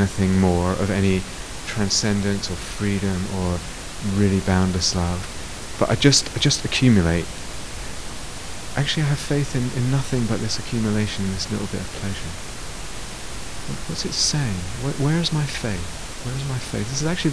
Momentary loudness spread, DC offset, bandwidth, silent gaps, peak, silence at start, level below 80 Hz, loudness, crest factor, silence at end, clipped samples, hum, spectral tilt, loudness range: 14 LU; 2%; 11 kHz; none; -2 dBFS; 0 s; -38 dBFS; -22 LUFS; 20 dB; 0 s; under 0.1%; none; -4.5 dB/octave; 6 LU